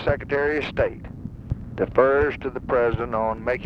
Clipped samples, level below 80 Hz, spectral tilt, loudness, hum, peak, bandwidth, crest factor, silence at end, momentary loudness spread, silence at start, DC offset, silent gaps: under 0.1%; -38 dBFS; -8 dB/octave; -23 LUFS; none; -4 dBFS; 6.6 kHz; 20 dB; 0 s; 14 LU; 0 s; under 0.1%; none